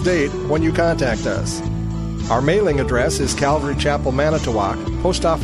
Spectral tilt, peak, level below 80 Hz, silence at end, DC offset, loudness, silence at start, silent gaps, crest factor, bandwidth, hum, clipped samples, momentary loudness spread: -5.5 dB/octave; -4 dBFS; -28 dBFS; 0 s; under 0.1%; -19 LUFS; 0 s; none; 14 dB; 14 kHz; none; under 0.1%; 6 LU